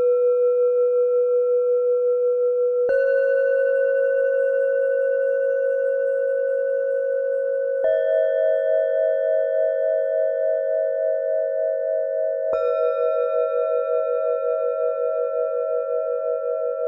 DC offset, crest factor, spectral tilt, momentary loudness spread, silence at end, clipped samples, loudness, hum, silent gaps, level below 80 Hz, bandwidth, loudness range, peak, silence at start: under 0.1%; 10 dB; -4.5 dB/octave; 4 LU; 0 s; under 0.1%; -21 LUFS; none; none; -74 dBFS; 3.9 kHz; 3 LU; -10 dBFS; 0 s